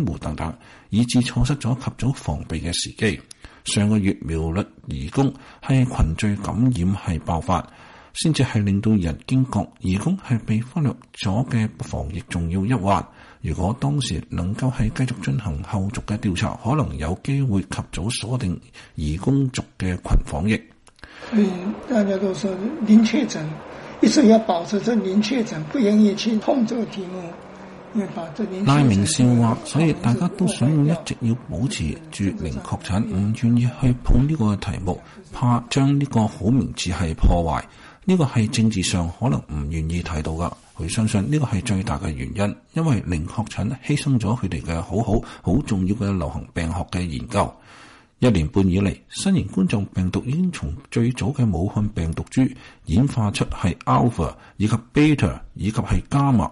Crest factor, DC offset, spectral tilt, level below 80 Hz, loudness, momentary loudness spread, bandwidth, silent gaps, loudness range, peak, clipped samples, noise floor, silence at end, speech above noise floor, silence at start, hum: 18 dB; under 0.1%; -6.5 dB/octave; -34 dBFS; -22 LUFS; 10 LU; 11.5 kHz; none; 5 LU; -4 dBFS; under 0.1%; -47 dBFS; 0 s; 26 dB; 0 s; none